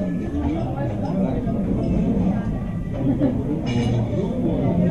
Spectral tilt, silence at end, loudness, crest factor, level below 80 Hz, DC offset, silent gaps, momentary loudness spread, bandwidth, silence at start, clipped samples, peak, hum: -9 dB/octave; 0 s; -23 LUFS; 14 dB; -32 dBFS; 0.7%; none; 4 LU; 9.2 kHz; 0 s; under 0.1%; -8 dBFS; none